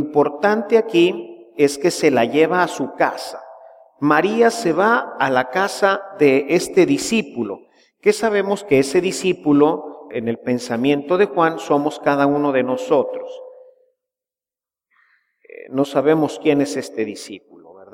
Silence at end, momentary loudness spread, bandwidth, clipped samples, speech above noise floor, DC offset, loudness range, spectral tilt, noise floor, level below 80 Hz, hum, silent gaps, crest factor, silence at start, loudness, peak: 0.1 s; 11 LU; 16 kHz; under 0.1%; over 72 dB; under 0.1%; 5 LU; -5 dB/octave; under -90 dBFS; -62 dBFS; none; none; 18 dB; 0 s; -18 LUFS; -2 dBFS